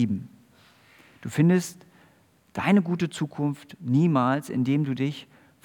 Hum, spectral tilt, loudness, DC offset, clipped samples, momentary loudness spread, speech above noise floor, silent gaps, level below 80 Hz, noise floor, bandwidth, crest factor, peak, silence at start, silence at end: none; -7 dB/octave; -25 LUFS; under 0.1%; under 0.1%; 15 LU; 36 dB; none; -72 dBFS; -60 dBFS; 18 kHz; 18 dB; -8 dBFS; 0 s; 0.4 s